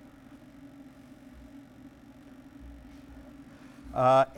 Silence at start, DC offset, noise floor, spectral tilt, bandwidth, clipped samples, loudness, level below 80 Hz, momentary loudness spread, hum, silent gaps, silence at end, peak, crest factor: 2.65 s; under 0.1%; -52 dBFS; -6.5 dB/octave; 12 kHz; under 0.1%; -26 LUFS; -56 dBFS; 25 LU; none; none; 0.15 s; -12 dBFS; 20 dB